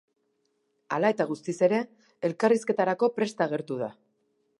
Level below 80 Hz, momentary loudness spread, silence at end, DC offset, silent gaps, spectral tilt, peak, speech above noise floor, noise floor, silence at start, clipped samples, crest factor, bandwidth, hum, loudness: -80 dBFS; 9 LU; 0.7 s; under 0.1%; none; -6 dB/octave; -10 dBFS; 48 dB; -74 dBFS; 0.9 s; under 0.1%; 20 dB; 11.5 kHz; none; -27 LUFS